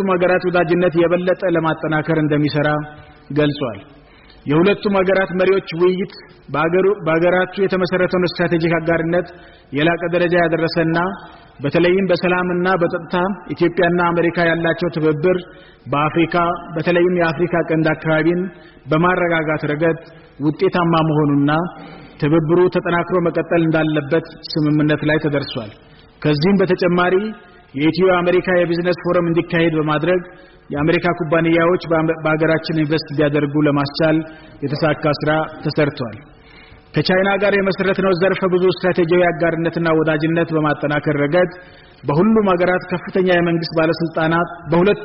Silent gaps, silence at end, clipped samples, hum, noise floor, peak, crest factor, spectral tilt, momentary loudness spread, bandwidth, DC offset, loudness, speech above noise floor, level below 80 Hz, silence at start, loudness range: none; 0 s; under 0.1%; none; -43 dBFS; -6 dBFS; 12 dB; -5.5 dB/octave; 7 LU; 5.8 kHz; under 0.1%; -17 LUFS; 26 dB; -48 dBFS; 0 s; 2 LU